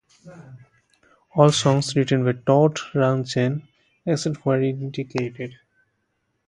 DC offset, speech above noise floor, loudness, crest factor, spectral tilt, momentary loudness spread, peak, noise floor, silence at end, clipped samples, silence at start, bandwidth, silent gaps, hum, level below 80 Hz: under 0.1%; 52 dB; -21 LUFS; 22 dB; -6 dB/octave; 13 LU; 0 dBFS; -73 dBFS; 0.95 s; under 0.1%; 0.25 s; 11 kHz; none; none; -62 dBFS